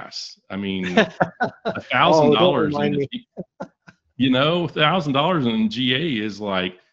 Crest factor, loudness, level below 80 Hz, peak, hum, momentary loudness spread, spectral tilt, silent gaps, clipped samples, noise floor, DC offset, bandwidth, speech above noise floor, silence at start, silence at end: 20 dB; -20 LUFS; -56 dBFS; 0 dBFS; none; 17 LU; -6 dB/octave; none; under 0.1%; -53 dBFS; under 0.1%; 7.6 kHz; 33 dB; 0 s; 0.2 s